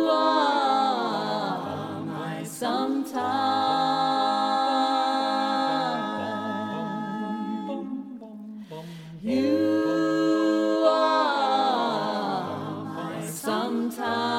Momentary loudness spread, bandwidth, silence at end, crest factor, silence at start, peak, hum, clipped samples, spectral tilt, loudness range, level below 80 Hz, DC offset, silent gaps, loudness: 11 LU; 16.5 kHz; 0 s; 18 dB; 0 s; -6 dBFS; none; under 0.1%; -5 dB/octave; 6 LU; -72 dBFS; under 0.1%; none; -25 LUFS